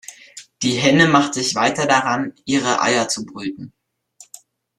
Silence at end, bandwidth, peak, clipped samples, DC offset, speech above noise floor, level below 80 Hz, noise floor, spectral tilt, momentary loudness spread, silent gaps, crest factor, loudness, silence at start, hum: 1.1 s; 13 kHz; -2 dBFS; under 0.1%; under 0.1%; 32 dB; -58 dBFS; -50 dBFS; -3.5 dB/octave; 16 LU; none; 18 dB; -17 LUFS; 0.1 s; none